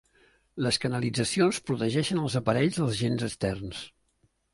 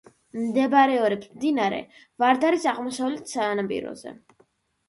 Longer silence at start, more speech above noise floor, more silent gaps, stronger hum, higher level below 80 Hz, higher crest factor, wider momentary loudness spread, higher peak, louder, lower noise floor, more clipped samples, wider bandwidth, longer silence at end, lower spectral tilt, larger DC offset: first, 0.55 s vs 0.35 s; about the same, 43 dB vs 40 dB; neither; neither; first, -56 dBFS vs -68 dBFS; about the same, 20 dB vs 18 dB; second, 12 LU vs 16 LU; second, -10 dBFS vs -6 dBFS; second, -28 LUFS vs -24 LUFS; first, -70 dBFS vs -64 dBFS; neither; about the same, 11.5 kHz vs 11.5 kHz; about the same, 0.65 s vs 0.75 s; about the same, -5 dB/octave vs -4.5 dB/octave; neither